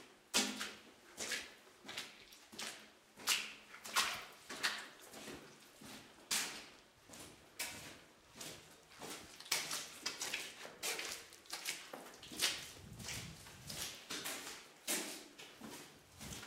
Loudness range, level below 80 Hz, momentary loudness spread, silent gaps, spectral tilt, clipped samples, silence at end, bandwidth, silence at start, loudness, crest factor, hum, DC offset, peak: 5 LU; -74 dBFS; 19 LU; none; -0.5 dB/octave; under 0.1%; 0 s; 16 kHz; 0 s; -42 LUFS; 28 dB; none; under 0.1%; -18 dBFS